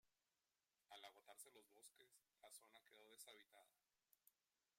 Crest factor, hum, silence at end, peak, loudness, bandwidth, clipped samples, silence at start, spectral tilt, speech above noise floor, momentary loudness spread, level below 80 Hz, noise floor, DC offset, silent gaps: 26 dB; none; 0.45 s; -44 dBFS; -65 LUFS; 16 kHz; under 0.1%; 0.05 s; 0.5 dB/octave; over 21 dB; 5 LU; under -90 dBFS; under -90 dBFS; under 0.1%; none